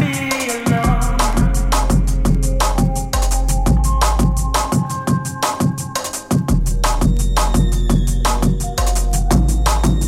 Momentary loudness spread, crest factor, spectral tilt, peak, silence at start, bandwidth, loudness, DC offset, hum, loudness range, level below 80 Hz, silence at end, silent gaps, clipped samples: 3 LU; 14 dB; -5 dB/octave; 0 dBFS; 0 s; 16 kHz; -18 LUFS; under 0.1%; none; 1 LU; -18 dBFS; 0 s; none; under 0.1%